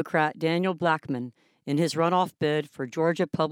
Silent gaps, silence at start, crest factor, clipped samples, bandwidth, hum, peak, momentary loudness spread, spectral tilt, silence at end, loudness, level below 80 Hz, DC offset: none; 0 s; 18 dB; under 0.1%; 16.5 kHz; none; -8 dBFS; 9 LU; -6 dB/octave; 0 s; -26 LUFS; -72 dBFS; under 0.1%